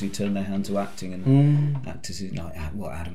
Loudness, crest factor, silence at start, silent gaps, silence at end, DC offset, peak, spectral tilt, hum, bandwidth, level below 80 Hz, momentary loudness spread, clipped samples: -25 LUFS; 16 dB; 0 s; none; 0 s; 2%; -8 dBFS; -7 dB/octave; none; 12.5 kHz; -48 dBFS; 15 LU; under 0.1%